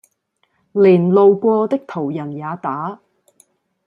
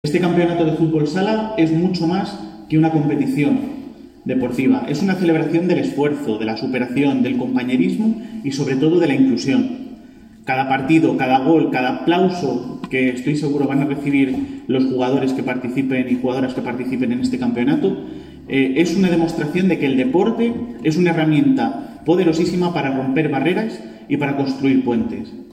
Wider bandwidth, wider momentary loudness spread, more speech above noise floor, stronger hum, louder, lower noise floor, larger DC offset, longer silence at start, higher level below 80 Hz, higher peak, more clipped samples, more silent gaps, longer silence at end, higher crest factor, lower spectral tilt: second, 4.9 kHz vs 10 kHz; first, 14 LU vs 8 LU; first, 51 dB vs 24 dB; neither; about the same, -16 LUFS vs -18 LUFS; first, -66 dBFS vs -42 dBFS; neither; first, 0.75 s vs 0.05 s; second, -66 dBFS vs -52 dBFS; about the same, -2 dBFS vs -2 dBFS; neither; neither; first, 0.9 s vs 0 s; about the same, 16 dB vs 16 dB; first, -9.5 dB/octave vs -7 dB/octave